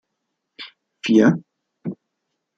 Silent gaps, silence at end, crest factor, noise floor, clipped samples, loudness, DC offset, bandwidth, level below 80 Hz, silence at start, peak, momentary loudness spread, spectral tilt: none; 0.65 s; 20 dB; -78 dBFS; under 0.1%; -18 LUFS; under 0.1%; 7.8 kHz; -68 dBFS; 0.6 s; -4 dBFS; 23 LU; -6.5 dB/octave